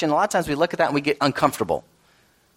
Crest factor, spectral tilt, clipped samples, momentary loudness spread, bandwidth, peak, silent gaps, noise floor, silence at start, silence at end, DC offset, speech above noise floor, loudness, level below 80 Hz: 20 dB; -5 dB/octave; under 0.1%; 6 LU; 16 kHz; -4 dBFS; none; -59 dBFS; 0 s; 0.75 s; under 0.1%; 38 dB; -22 LUFS; -54 dBFS